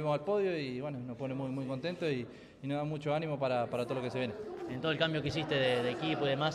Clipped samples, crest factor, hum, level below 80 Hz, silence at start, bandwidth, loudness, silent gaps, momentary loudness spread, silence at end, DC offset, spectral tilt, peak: under 0.1%; 18 dB; none; -66 dBFS; 0 s; 12.5 kHz; -35 LUFS; none; 8 LU; 0 s; under 0.1%; -6.5 dB/octave; -16 dBFS